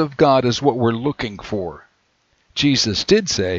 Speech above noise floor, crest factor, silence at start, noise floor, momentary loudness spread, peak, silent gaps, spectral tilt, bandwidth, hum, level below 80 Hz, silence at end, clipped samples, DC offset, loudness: 45 dB; 18 dB; 0 s; -63 dBFS; 12 LU; 0 dBFS; none; -4.5 dB/octave; 7.8 kHz; none; -48 dBFS; 0 s; under 0.1%; under 0.1%; -18 LUFS